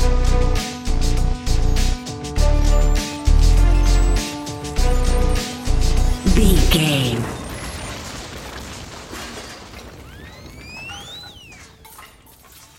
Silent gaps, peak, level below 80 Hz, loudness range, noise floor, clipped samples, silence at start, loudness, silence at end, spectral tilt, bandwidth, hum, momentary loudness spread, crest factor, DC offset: none; -2 dBFS; -18 dBFS; 15 LU; -46 dBFS; under 0.1%; 0 s; -21 LUFS; 0.75 s; -5 dB/octave; 15.5 kHz; none; 22 LU; 16 dB; under 0.1%